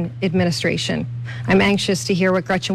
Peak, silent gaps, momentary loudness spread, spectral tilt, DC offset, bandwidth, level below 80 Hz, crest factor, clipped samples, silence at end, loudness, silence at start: -6 dBFS; none; 9 LU; -5 dB/octave; under 0.1%; 13.5 kHz; -46 dBFS; 12 dB; under 0.1%; 0 s; -19 LUFS; 0 s